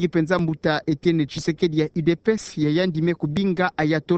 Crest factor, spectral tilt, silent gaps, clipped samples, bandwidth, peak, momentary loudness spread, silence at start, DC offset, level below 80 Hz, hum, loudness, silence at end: 16 dB; -6.5 dB/octave; none; under 0.1%; 8.6 kHz; -6 dBFS; 2 LU; 0 s; under 0.1%; -52 dBFS; none; -22 LUFS; 0 s